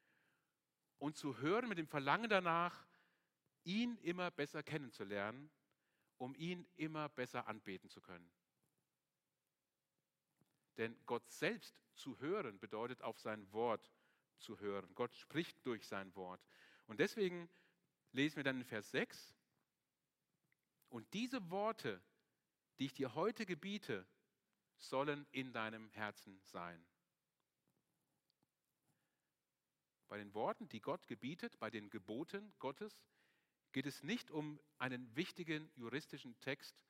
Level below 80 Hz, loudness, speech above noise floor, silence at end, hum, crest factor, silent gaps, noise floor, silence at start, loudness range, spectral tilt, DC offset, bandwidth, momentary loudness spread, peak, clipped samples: -88 dBFS; -45 LUFS; over 45 dB; 0.2 s; none; 28 dB; none; under -90 dBFS; 1 s; 11 LU; -5.5 dB/octave; under 0.1%; 16 kHz; 15 LU; -20 dBFS; under 0.1%